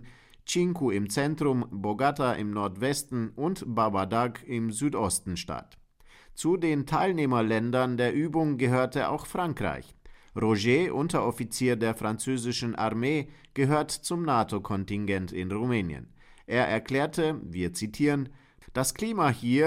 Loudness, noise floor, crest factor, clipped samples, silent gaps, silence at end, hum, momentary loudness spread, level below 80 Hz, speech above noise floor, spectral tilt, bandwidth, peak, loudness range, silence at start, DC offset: -28 LUFS; -55 dBFS; 18 dB; under 0.1%; none; 0 s; none; 7 LU; -54 dBFS; 28 dB; -5.5 dB/octave; 16 kHz; -12 dBFS; 3 LU; 0 s; under 0.1%